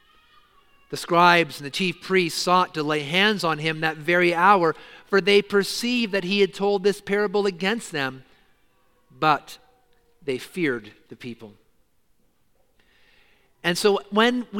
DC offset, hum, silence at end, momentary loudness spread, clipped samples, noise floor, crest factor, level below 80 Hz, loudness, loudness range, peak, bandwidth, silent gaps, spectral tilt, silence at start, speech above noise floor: under 0.1%; none; 0 s; 14 LU; under 0.1%; -67 dBFS; 22 dB; -64 dBFS; -22 LUFS; 13 LU; -2 dBFS; 17 kHz; none; -4.5 dB/octave; 0.9 s; 45 dB